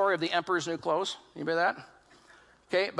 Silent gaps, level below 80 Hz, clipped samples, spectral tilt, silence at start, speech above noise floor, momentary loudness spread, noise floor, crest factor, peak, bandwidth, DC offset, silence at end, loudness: none; -74 dBFS; under 0.1%; -4 dB/octave; 0 s; 29 dB; 8 LU; -59 dBFS; 18 dB; -12 dBFS; 11.5 kHz; under 0.1%; 0 s; -30 LUFS